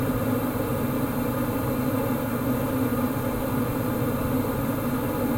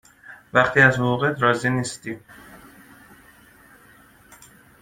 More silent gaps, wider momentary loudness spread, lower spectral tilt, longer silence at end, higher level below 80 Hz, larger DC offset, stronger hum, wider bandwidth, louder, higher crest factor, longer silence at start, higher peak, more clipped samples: neither; second, 1 LU vs 18 LU; first, -7 dB/octave vs -5.5 dB/octave; second, 0 s vs 2.25 s; first, -42 dBFS vs -56 dBFS; neither; neither; about the same, 17 kHz vs 16 kHz; second, -26 LUFS vs -19 LUFS; second, 12 dB vs 24 dB; second, 0 s vs 0.3 s; second, -12 dBFS vs 0 dBFS; neither